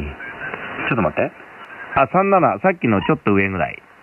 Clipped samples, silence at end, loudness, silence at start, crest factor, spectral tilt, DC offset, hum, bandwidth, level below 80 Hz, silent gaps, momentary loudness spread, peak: under 0.1%; 0.25 s; -19 LUFS; 0 s; 16 dB; -9 dB/octave; under 0.1%; none; 4.2 kHz; -44 dBFS; none; 15 LU; -2 dBFS